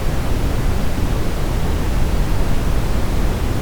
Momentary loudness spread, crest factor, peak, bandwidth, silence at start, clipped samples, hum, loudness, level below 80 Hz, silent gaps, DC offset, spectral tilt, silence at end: 1 LU; 10 dB; -4 dBFS; over 20 kHz; 0 s; under 0.1%; none; -21 LUFS; -20 dBFS; none; under 0.1%; -6 dB/octave; 0 s